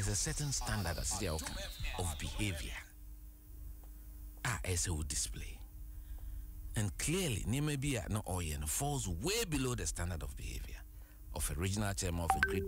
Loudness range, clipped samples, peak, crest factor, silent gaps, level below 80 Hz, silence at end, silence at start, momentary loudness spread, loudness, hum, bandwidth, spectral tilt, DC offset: 5 LU; under 0.1%; -16 dBFS; 22 dB; none; -46 dBFS; 0 s; 0 s; 18 LU; -38 LUFS; none; 16 kHz; -3.5 dB/octave; under 0.1%